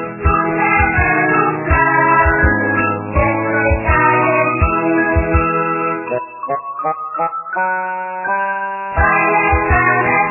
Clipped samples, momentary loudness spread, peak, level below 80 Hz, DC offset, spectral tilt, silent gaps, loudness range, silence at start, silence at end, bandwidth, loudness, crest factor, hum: under 0.1%; 9 LU; 0 dBFS; -26 dBFS; under 0.1%; -11.5 dB/octave; none; 6 LU; 0 s; 0 s; 3 kHz; -15 LUFS; 14 dB; none